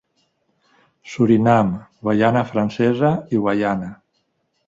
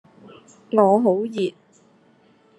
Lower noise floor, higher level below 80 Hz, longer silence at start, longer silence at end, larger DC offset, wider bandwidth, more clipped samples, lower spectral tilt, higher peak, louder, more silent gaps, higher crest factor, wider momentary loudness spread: first, -69 dBFS vs -56 dBFS; first, -54 dBFS vs -74 dBFS; first, 1.05 s vs 0.7 s; second, 0.75 s vs 1.1 s; neither; second, 7.8 kHz vs 11 kHz; neither; about the same, -8 dB/octave vs -7.5 dB/octave; about the same, -2 dBFS vs -2 dBFS; about the same, -18 LUFS vs -20 LUFS; neither; about the same, 18 dB vs 20 dB; about the same, 11 LU vs 11 LU